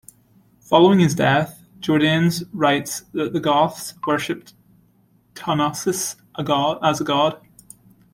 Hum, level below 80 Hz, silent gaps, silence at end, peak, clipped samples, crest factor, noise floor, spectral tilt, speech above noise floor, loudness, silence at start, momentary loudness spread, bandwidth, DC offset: none; -58 dBFS; none; 0.75 s; -2 dBFS; under 0.1%; 18 dB; -58 dBFS; -5 dB/octave; 39 dB; -20 LUFS; 0.7 s; 13 LU; 16.5 kHz; under 0.1%